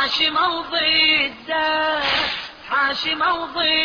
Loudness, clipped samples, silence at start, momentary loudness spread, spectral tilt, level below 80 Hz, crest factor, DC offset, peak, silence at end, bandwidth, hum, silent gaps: -18 LUFS; under 0.1%; 0 s; 7 LU; -2.5 dB/octave; -52 dBFS; 14 dB; under 0.1%; -6 dBFS; 0 s; 5.4 kHz; none; none